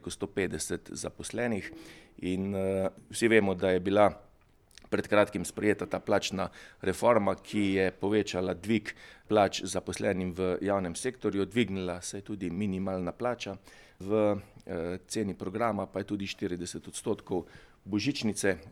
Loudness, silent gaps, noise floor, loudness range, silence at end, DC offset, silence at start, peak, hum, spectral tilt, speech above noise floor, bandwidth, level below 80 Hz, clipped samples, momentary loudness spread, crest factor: -31 LUFS; none; -62 dBFS; 5 LU; 0 s; under 0.1%; 0.05 s; -8 dBFS; none; -5 dB/octave; 31 dB; 15.5 kHz; -60 dBFS; under 0.1%; 12 LU; 22 dB